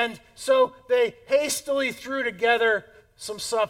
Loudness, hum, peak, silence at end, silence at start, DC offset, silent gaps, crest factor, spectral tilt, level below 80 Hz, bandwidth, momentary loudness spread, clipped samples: -24 LUFS; none; -8 dBFS; 0 s; 0 s; under 0.1%; none; 16 dB; -2 dB/octave; -64 dBFS; 17 kHz; 11 LU; under 0.1%